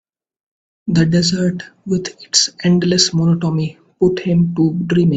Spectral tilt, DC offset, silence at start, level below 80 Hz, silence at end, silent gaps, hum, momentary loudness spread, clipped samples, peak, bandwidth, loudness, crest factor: -5 dB/octave; under 0.1%; 0.85 s; -50 dBFS; 0 s; none; none; 8 LU; under 0.1%; 0 dBFS; 9 kHz; -16 LUFS; 16 dB